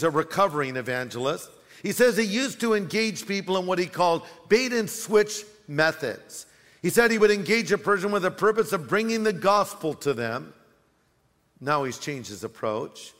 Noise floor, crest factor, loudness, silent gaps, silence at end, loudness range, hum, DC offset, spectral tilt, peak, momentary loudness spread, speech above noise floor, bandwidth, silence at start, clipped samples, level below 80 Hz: -67 dBFS; 20 dB; -25 LUFS; none; 0.1 s; 4 LU; none; under 0.1%; -4 dB/octave; -6 dBFS; 12 LU; 42 dB; 16 kHz; 0 s; under 0.1%; -64 dBFS